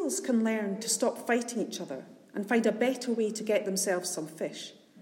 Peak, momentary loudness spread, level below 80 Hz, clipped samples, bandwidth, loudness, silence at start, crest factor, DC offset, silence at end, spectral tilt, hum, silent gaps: -14 dBFS; 12 LU; -86 dBFS; under 0.1%; 16.5 kHz; -30 LUFS; 0 s; 16 dB; under 0.1%; 0 s; -3.5 dB/octave; none; none